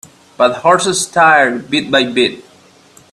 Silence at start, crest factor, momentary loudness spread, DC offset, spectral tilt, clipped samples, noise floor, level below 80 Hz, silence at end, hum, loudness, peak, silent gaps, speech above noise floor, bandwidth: 0.4 s; 14 dB; 6 LU; under 0.1%; -3 dB/octave; under 0.1%; -46 dBFS; -56 dBFS; 0.7 s; none; -12 LUFS; 0 dBFS; none; 33 dB; 13.5 kHz